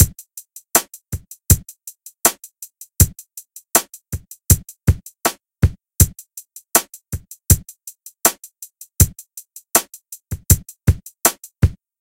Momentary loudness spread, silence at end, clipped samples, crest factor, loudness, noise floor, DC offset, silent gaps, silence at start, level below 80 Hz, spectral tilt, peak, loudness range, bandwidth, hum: 20 LU; 0.3 s; under 0.1%; 20 dB; -18 LUFS; -41 dBFS; under 0.1%; none; 0 s; -28 dBFS; -3.5 dB/octave; 0 dBFS; 1 LU; 17 kHz; none